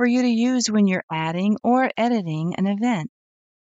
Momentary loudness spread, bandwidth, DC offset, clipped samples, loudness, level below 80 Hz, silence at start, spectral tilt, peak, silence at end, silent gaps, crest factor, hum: 6 LU; 8 kHz; under 0.1%; under 0.1%; -21 LUFS; -70 dBFS; 0 s; -5.5 dB/octave; -8 dBFS; 0.65 s; 1.03-1.08 s; 12 dB; none